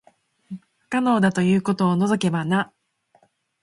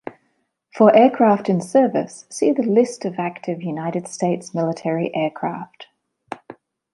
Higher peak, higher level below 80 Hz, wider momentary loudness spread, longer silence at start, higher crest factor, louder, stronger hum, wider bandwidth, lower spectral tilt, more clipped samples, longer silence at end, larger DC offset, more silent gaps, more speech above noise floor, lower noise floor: second, -6 dBFS vs -2 dBFS; first, -62 dBFS vs -70 dBFS; about the same, 21 LU vs 21 LU; first, 0.5 s vs 0.05 s; about the same, 18 dB vs 18 dB; about the same, -21 LUFS vs -19 LUFS; neither; about the same, 11.5 kHz vs 11.5 kHz; about the same, -6.5 dB/octave vs -6.5 dB/octave; neither; first, 1 s vs 0.4 s; neither; neither; second, 42 dB vs 50 dB; second, -62 dBFS vs -69 dBFS